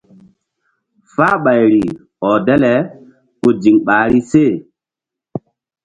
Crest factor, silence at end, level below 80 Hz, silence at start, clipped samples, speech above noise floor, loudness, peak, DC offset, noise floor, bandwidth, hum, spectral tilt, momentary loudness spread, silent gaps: 14 dB; 0.45 s; -48 dBFS; 1.2 s; under 0.1%; 73 dB; -13 LUFS; 0 dBFS; under 0.1%; -85 dBFS; 8.8 kHz; none; -7.5 dB/octave; 15 LU; none